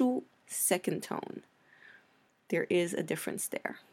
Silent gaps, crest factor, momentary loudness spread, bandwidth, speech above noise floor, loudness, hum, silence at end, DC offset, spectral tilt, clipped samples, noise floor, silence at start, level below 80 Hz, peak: none; 20 dB; 10 LU; 16.5 kHz; 34 dB; -33 LUFS; none; 0.15 s; under 0.1%; -4 dB/octave; under 0.1%; -68 dBFS; 0 s; -82 dBFS; -14 dBFS